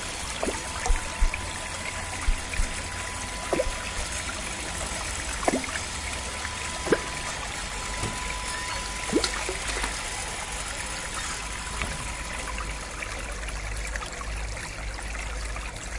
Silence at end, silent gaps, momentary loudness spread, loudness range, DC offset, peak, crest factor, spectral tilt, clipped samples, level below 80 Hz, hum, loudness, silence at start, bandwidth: 0 s; none; 7 LU; 4 LU; under 0.1%; -8 dBFS; 22 dB; -2.5 dB/octave; under 0.1%; -34 dBFS; none; -30 LUFS; 0 s; 11.5 kHz